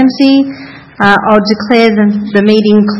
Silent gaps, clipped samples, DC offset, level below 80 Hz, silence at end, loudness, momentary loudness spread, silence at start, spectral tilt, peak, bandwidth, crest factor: none; 1%; under 0.1%; -46 dBFS; 0 s; -9 LUFS; 4 LU; 0 s; -7 dB/octave; 0 dBFS; 6.8 kHz; 8 dB